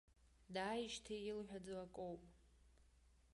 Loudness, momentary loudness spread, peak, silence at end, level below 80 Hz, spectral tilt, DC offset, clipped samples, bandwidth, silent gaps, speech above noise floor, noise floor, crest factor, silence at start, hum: -49 LUFS; 7 LU; -32 dBFS; 0.05 s; -72 dBFS; -4 dB/octave; under 0.1%; under 0.1%; 11.5 kHz; none; 24 dB; -72 dBFS; 18 dB; 0.25 s; none